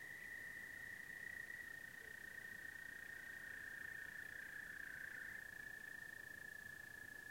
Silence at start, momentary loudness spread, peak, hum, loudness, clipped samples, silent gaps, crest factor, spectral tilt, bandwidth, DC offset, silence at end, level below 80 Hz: 0 s; 3 LU; -40 dBFS; none; -51 LUFS; under 0.1%; none; 14 dB; -2 dB/octave; 16.5 kHz; under 0.1%; 0 s; -78 dBFS